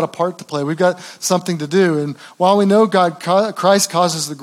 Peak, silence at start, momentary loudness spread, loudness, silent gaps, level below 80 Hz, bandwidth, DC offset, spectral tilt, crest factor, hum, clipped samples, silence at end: 0 dBFS; 0 s; 9 LU; -16 LUFS; none; -78 dBFS; 16.5 kHz; under 0.1%; -4.5 dB/octave; 16 dB; none; under 0.1%; 0 s